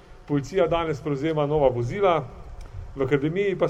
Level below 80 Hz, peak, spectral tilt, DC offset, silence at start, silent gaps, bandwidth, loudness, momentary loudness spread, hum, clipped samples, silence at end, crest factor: -42 dBFS; -6 dBFS; -7.5 dB/octave; under 0.1%; 0.1 s; none; 9 kHz; -24 LUFS; 18 LU; none; under 0.1%; 0 s; 18 dB